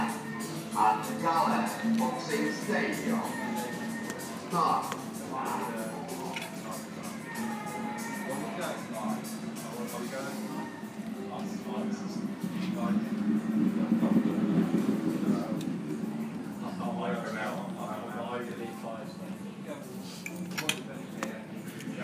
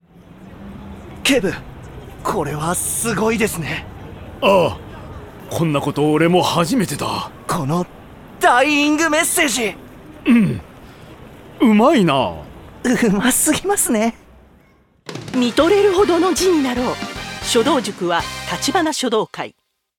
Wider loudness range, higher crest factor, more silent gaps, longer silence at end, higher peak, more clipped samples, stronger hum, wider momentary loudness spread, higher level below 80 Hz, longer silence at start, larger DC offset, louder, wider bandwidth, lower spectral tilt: first, 8 LU vs 3 LU; first, 22 dB vs 14 dB; neither; second, 0 s vs 0.5 s; second, -12 dBFS vs -4 dBFS; neither; neither; second, 12 LU vs 21 LU; second, -74 dBFS vs -44 dBFS; second, 0 s vs 0.4 s; neither; second, -33 LUFS vs -17 LUFS; second, 15.5 kHz vs 18 kHz; about the same, -5 dB/octave vs -4 dB/octave